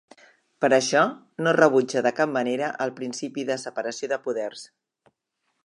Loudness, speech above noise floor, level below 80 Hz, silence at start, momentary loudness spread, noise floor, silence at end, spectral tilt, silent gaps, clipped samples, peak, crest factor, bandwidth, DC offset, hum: -24 LUFS; 53 dB; -78 dBFS; 0.6 s; 12 LU; -76 dBFS; 1 s; -4 dB/octave; none; under 0.1%; -2 dBFS; 22 dB; 11.5 kHz; under 0.1%; none